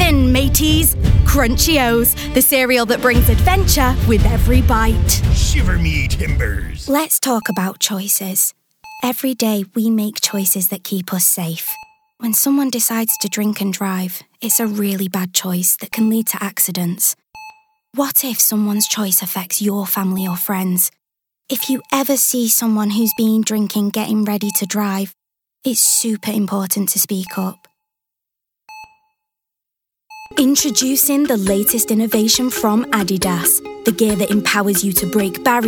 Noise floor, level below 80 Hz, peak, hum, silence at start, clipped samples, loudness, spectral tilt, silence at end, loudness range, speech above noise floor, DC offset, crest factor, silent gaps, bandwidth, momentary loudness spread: -82 dBFS; -24 dBFS; 0 dBFS; none; 0 s; under 0.1%; -16 LUFS; -4 dB/octave; 0 s; 5 LU; 66 dB; under 0.1%; 16 dB; none; over 20 kHz; 7 LU